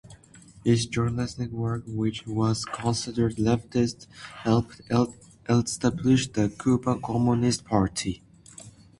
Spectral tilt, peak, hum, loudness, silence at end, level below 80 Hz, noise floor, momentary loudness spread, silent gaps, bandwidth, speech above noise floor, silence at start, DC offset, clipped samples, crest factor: -6 dB/octave; -6 dBFS; none; -26 LUFS; 0.3 s; -50 dBFS; -51 dBFS; 9 LU; none; 11.5 kHz; 26 dB; 0.05 s; under 0.1%; under 0.1%; 20 dB